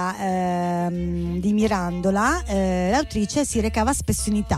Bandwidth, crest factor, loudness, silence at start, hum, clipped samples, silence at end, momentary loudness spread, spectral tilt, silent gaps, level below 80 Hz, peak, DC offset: 15 kHz; 14 dB; -22 LUFS; 0 s; none; under 0.1%; 0 s; 4 LU; -5.5 dB/octave; none; -34 dBFS; -8 dBFS; under 0.1%